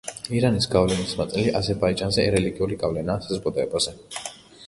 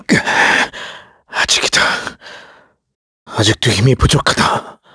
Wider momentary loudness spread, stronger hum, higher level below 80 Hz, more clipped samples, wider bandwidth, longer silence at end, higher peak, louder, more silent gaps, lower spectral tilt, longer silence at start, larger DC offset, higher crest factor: second, 7 LU vs 15 LU; neither; second, -44 dBFS vs -32 dBFS; neither; about the same, 11.5 kHz vs 11 kHz; second, 0 s vs 0.2 s; second, -4 dBFS vs 0 dBFS; second, -23 LUFS vs -13 LUFS; second, none vs 2.95-3.26 s; first, -5 dB/octave vs -3.5 dB/octave; about the same, 0.05 s vs 0.1 s; neither; about the same, 20 dB vs 16 dB